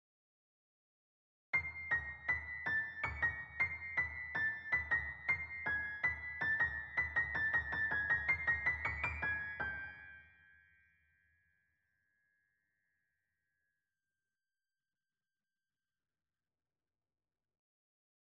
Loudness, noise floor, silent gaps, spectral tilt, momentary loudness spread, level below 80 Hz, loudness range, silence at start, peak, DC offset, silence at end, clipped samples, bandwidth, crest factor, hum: -37 LUFS; under -90 dBFS; none; -5.5 dB/octave; 5 LU; -60 dBFS; 8 LU; 1.55 s; -24 dBFS; under 0.1%; 8.15 s; under 0.1%; 7.8 kHz; 18 dB; none